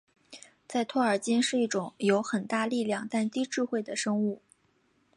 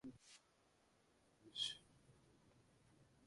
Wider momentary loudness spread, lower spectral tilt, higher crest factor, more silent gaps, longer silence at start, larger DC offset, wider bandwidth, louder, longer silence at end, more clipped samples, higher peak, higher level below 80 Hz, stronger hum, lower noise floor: second, 8 LU vs 21 LU; first, -4.5 dB/octave vs -1.5 dB/octave; second, 18 dB vs 26 dB; neither; first, 0.3 s vs 0.05 s; neither; about the same, 11.5 kHz vs 11.5 kHz; first, -29 LUFS vs -47 LUFS; first, 0.8 s vs 0 s; neither; first, -12 dBFS vs -30 dBFS; about the same, -80 dBFS vs -84 dBFS; neither; second, -69 dBFS vs -77 dBFS